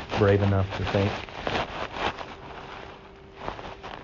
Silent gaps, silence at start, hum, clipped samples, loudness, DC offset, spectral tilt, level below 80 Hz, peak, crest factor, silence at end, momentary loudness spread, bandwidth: none; 0 s; none; under 0.1%; -27 LUFS; under 0.1%; -5 dB/octave; -46 dBFS; -8 dBFS; 20 dB; 0 s; 19 LU; 7.2 kHz